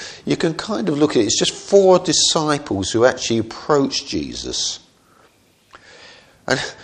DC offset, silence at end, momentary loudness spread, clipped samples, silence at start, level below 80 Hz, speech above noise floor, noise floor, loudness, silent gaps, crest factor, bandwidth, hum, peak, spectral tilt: under 0.1%; 0 s; 10 LU; under 0.1%; 0 s; -50 dBFS; 37 dB; -55 dBFS; -18 LUFS; none; 20 dB; 10.5 kHz; none; 0 dBFS; -3.5 dB/octave